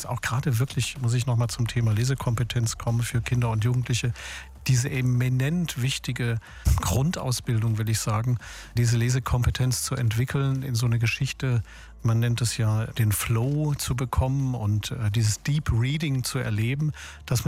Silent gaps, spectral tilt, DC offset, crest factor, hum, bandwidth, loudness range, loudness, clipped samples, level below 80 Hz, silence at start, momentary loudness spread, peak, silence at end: none; -5 dB/octave; under 0.1%; 14 dB; none; 16 kHz; 1 LU; -26 LUFS; under 0.1%; -38 dBFS; 0 s; 4 LU; -12 dBFS; 0 s